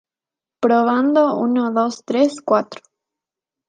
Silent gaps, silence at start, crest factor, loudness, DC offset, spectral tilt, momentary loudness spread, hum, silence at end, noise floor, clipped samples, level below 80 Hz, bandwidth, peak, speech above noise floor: none; 0.6 s; 16 dB; -18 LUFS; under 0.1%; -5.5 dB/octave; 5 LU; none; 0.95 s; -89 dBFS; under 0.1%; -74 dBFS; 9.4 kHz; -2 dBFS; 72 dB